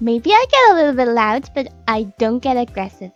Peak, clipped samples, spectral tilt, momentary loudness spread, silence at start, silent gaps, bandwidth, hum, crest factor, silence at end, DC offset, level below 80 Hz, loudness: 0 dBFS; under 0.1%; -4.5 dB/octave; 12 LU; 0 s; none; 7.6 kHz; none; 16 dB; 0.05 s; under 0.1%; -46 dBFS; -15 LUFS